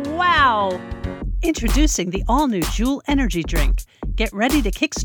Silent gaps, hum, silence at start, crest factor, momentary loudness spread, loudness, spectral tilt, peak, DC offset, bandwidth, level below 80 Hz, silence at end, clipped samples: none; none; 0 s; 16 dB; 12 LU; -20 LUFS; -4 dB/octave; -4 dBFS; under 0.1%; over 20 kHz; -24 dBFS; 0 s; under 0.1%